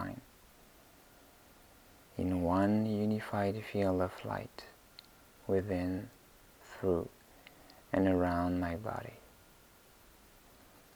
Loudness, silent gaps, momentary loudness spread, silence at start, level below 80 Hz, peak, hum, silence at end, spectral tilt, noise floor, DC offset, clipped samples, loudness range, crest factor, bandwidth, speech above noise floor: -34 LUFS; none; 25 LU; 0 s; -64 dBFS; -18 dBFS; none; 1.7 s; -7.5 dB/octave; -61 dBFS; under 0.1%; under 0.1%; 4 LU; 18 dB; over 20 kHz; 28 dB